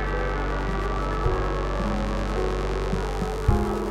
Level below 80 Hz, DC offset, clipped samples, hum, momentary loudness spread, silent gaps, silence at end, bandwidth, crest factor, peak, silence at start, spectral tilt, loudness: -28 dBFS; under 0.1%; under 0.1%; none; 3 LU; none; 0 s; 11 kHz; 18 dB; -8 dBFS; 0 s; -6.5 dB/octave; -27 LUFS